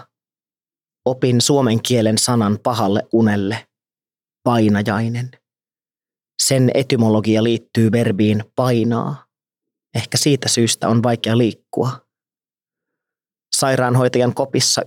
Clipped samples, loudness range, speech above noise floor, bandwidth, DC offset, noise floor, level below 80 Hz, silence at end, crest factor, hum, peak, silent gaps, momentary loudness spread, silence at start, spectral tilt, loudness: under 0.1%; 3 LU; over 74 dB; 16.5 kHz; under 0.1%; under -90 dBFS; -68 dBFS; 0 s; 16 dB; none; -2 dBFS; none; 9 LU; 1.05 s; -5 dB/octave; -17 LUFS